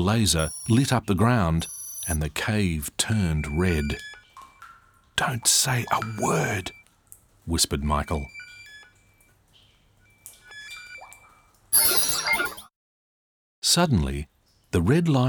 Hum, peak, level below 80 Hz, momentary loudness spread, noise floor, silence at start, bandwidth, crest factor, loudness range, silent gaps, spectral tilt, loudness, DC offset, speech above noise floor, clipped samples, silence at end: none; -6 dBFS; -42 dBFS; 20 LU; -60 dBFS; 0 s; over 20 kHz; 20 dB; 7 LU; 12.76-13.62 s; -4 dB/octave; -23 LUFS; under 0.1%; 37 dB; under 0.1%; 0 s